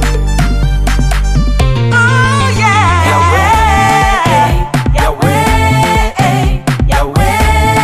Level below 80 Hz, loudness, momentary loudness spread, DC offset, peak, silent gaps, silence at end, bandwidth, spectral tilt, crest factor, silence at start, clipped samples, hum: -14 dBFS; -10 LUFS; 5 LU; under 0.1%; 0 dBFS; none; 0 s; 15.5 kHz; -5 dB/octave; 8 dB; 0 s; under 0.1%; none